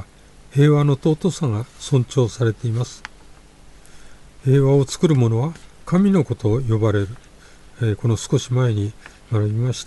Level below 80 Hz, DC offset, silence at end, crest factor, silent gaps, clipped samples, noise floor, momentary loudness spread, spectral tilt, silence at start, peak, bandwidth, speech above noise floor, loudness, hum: -46 dBFS; under 0.1%; 0.05 s; 16 dB; none; under 0.1%; -46 dBFS; 11 LU; -7 dB/octave; 0 s; -4 dBFS; 11.5 kHz; 27 dB; -20 LUFS; 50 Hz at -45 dBFS